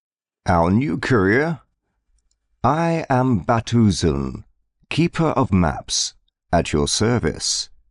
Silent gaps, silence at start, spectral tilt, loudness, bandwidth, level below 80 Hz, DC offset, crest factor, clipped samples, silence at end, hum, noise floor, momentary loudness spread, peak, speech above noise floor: none; 0.45 s; -5 dB/octave; -20 LUFS; 11 kHz; -40 dBFS; under 0.1%; 14 dB; under 0.1%; 0.25 s; none; -68 dBFS; 8 LU; -6 dBFS; 50 dB